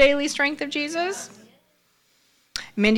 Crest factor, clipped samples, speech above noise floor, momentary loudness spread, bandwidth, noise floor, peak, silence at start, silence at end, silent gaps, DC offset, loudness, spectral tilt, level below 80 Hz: 18 dB; under 0.1%; 41 dB; 14 LU; 16 kHz; -65 dBFS; -6 dBFS; 0 s; 0 s; none; under 0.1%; -24 LUFS; -3.5 dB/octave; -50 dBFS